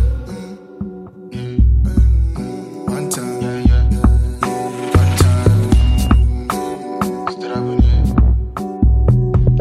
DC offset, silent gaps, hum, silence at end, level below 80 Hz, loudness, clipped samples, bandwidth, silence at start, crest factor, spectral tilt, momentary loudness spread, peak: under 0.1%; none; none; 0 s; -16 dBFS; -16 LUFS; under 0.1%; 13.5 kHz; 0 s; 14 dB; -7 dB/octave; 15 LU; 0 dBFS